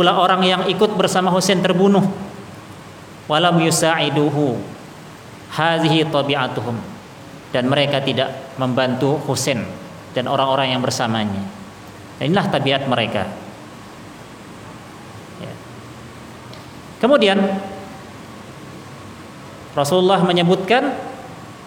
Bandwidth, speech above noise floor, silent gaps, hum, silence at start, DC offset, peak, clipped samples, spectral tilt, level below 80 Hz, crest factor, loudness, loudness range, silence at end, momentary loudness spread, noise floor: 18.5 kHz; 21 dB; none; none; 0 s; under 0.1%; -2 dBFS; under 0.1%; -5 dB/octave; -58 dBFS; 18 dB; -18 LUFS; 6 LU; 0 s; 22 LU; -38 dBFS